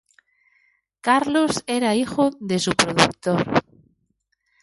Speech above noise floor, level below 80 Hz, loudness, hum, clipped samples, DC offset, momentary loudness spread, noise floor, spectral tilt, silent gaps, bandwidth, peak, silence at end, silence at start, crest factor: 51 dB; -56 dBFS; -20 LUFS; none; under 0.1%; under 0.1%; 5 LU; -71 dBFS; -4 dB/octave; none; 11.5 kHz; 0 dBFS; 1 s; 1.05 s; 22 dB